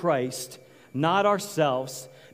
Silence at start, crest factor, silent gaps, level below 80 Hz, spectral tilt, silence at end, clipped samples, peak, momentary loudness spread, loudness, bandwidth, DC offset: 0 s; 18 dB; none; -74 dBFS; -5 dB/octave; 0.25 s; under 0.1%; -8 dBFS; 15 LU; -26 LUFS; 16 kHz; under 0.1%